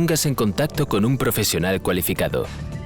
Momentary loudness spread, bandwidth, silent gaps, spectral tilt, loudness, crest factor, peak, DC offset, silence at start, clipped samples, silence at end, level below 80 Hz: 4 LU; over 20 kHz; none; -4.5 dB/octave; -21 LUFS; 10 dB; -12 dBFS; under 0.1%; 0 s; under 0.1%; 0 s; -40 dBFS